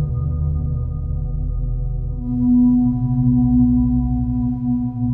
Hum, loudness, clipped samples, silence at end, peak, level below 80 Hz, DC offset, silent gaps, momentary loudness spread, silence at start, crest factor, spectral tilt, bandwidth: none; -19 LUFS; under 0.1%; 0 s; -6 dBFS; -26 dBFS; under 0.1%; none; 10 LU; 0 s; 12 dB; -14.5 dB/octave; 1.3 kHz